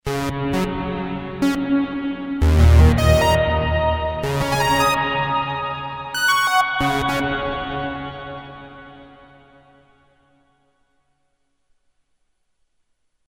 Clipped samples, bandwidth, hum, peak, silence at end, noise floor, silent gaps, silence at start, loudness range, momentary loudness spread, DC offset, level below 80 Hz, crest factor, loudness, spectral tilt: under 0.1%; over 20 kHz; none; -2 dBFS; 4.2 s; -71 dBFS; none; 0.05 s; 13 LU; 13 LU; under 0.1%; -26 dBFS; 18 dB; -19 LUFS; -5.5 dB/octave